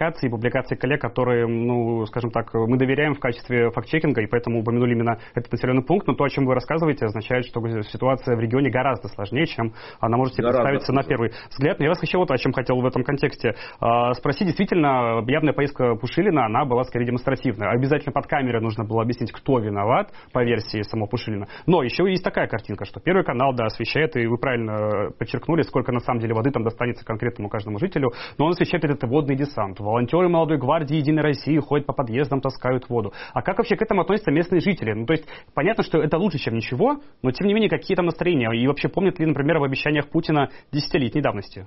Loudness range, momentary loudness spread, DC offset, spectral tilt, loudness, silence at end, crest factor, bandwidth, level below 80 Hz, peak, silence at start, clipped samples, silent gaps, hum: 2 LU; 6 LU; under 0.1%; -5.5 dB/octave; -22 LUFS; 0 s; 16 dB; 6 kHz; -46 dBFS; -6 dBFS; 0 s; under 0.1%; none; none